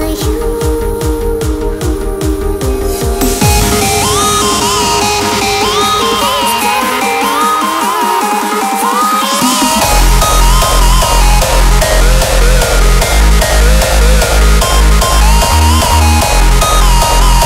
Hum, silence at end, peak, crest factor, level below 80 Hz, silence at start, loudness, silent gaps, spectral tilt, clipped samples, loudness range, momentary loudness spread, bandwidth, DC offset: none; 0 s; 0 dBFS; 8 dB; -12 dBFS; 0 s; -10 LUFS; none; -3.5 dB/octave; under 0.1%; 3 LU; 6 LU; 16.5 kHz; under 0.1%